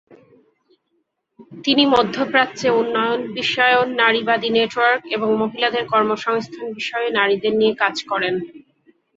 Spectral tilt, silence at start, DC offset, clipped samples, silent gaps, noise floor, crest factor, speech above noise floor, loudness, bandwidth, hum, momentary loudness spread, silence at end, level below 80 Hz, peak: -4 dB/octave; 0.1 s; under 0.1%; under 0.1%; none; -70 dBFS; 18 dB; 52 dB; -18 LUFS; 7.8 kHz; none; 8 LU; 0.6 s; -62 dBFS; -2 dBFS